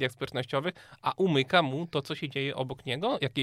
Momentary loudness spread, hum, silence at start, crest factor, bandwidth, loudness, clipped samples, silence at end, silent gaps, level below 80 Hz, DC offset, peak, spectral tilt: 10 LU; none; 0 s; 20 dB; 14.5 kHz; -30 LUFS; under 0.1%; 0 s; none; -66 dBFS; under 0.1%; -10 dBFS; -6 dB/octave